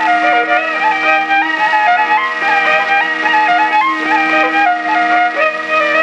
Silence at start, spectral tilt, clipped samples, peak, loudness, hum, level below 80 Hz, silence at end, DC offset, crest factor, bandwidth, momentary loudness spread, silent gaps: 0 s; -2.5 dB/octave; under 0.1%; 0 dBFS; -12 LUFS; none; -62 dBFS; 0 s; under 0.1%; 12 dB; 9.6 kHz; 2 LU; none